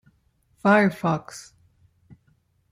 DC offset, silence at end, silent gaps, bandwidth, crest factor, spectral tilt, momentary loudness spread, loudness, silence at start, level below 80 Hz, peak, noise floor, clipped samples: under 0.1%; 1.3 s; none; 15 kHz; 20 dB; -6.5 dB/octave; 23 LU; -22 LUFS; 0.65 s; -66 dBFS; -6 dBFS; -65 dBFS; under 0.1%